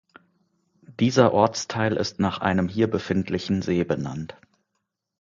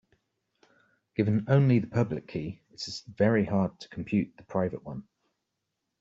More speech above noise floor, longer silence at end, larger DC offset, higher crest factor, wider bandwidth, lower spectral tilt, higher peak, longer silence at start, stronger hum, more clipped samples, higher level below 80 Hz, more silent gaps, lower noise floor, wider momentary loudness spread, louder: about the same, 56 dB vs 55 dB; about the same, 0.9 s vs 1 s; neither; about the same, 22 dB vs 18 dB; about the same, 7.6 kHz vs 7.8 kHz; second, -6 dB/octave vs -7.5 dB/octave; first, -2 dBFS vs -10 dBFS; second, 0.9 s vs 1.2 s; neither; neither; first, -50 dBFS vs -62 dBFS; neither; second, -79 dBFS vs -83 dBFS; second, 9 LU vs 16 LU; first, -23 LUFS vs -28 LUFS